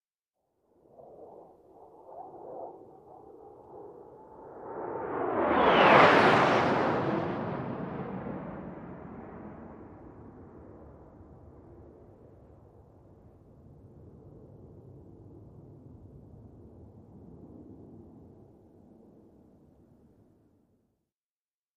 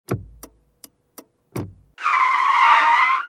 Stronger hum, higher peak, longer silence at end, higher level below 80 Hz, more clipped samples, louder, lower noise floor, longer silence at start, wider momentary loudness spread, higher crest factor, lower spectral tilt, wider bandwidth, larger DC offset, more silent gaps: neither; second, -6 dBFS vs -2 dBFS; first, 3.8 s vs 0 s; second, -62 dBFS vs -54 dBFS; neither; second, -25 LUFS vs -16 LUFS; first, under -90 dBFS vs -51 dBFS; first, 1.2 s vs 0.1 s; first, 31 LU vs 20 LU; first, 28 dB vs 18 dB; first, -6 dB/octave vs -3.5 dB/octave; second, 12 kHz vs 16 kHz; neither; neither